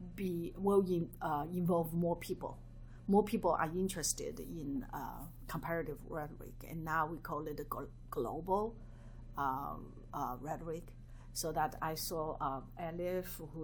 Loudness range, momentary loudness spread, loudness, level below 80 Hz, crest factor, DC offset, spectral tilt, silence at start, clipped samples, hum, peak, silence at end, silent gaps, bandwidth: 6 LU; 15 LU; -38 LUFS; -54 dBFS; 20 dB; under 0.1%; -5.5 dB/octave; 0 s; under 0.1%; none; -18 dBFS; 0 s; none; over 20 kHz